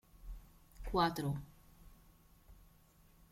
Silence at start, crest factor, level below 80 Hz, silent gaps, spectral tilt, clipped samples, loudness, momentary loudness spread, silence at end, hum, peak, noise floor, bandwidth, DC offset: 0.15 s; 22 dB; -54 dBFS; none; -6 dB/octave; under 0.1%; -37 LUFS; 23 LU; 0.7 s; none; -22 dBFS; -66 dBFS; 16.5 kHz; under 0.1%